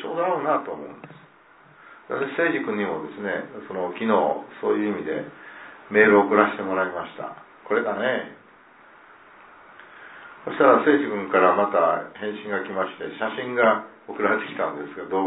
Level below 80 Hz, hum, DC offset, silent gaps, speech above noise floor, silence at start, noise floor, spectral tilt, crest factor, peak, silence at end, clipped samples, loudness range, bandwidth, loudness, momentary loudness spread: -72 dBFS; none; under 0.1%; none; 30 dB; 0 s; -53 dBFS; -9.5 dB/octave; 22 dB; -2 dBFS; 0 s; under 0.1%; 7 LU; 4 kHz; -23 LUFS; 20 LU